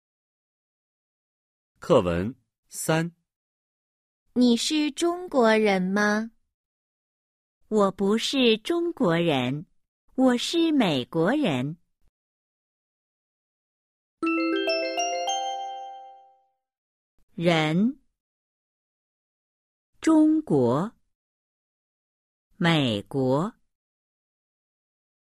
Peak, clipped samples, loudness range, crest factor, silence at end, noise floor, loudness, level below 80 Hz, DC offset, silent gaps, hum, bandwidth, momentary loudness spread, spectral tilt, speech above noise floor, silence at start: -8 dBFS; under 0.1%; 5 LU; 20 dB; 1.9 s; -65 dBFS; -24 LUFS; -62 dBFS; under 0.1%; 2.58-2.63 s, 3.36-4.26 s, 6.54-7.61 s, 9.88-10.08 s, 12.09-14.18 s, 16.78-17.28 s, 18.20-19.93 s, 21.15-22.51 s; 60 Hz at -55 dBFS; 15 kHz; 13 LU; -5 dB/octave; 42 dB; 1.8 s